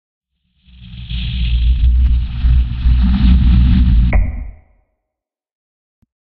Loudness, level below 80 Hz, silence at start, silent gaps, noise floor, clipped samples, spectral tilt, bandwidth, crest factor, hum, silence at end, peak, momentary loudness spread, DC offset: -15 LUFS; -14 dBFS; 0.9 s; none; -81 dBFS; under 0.1%; -7 dB/octave; 4.6 kHz; 14 dB; none; 1.8 s; 0 dBFS; 13 LU; under 0.1%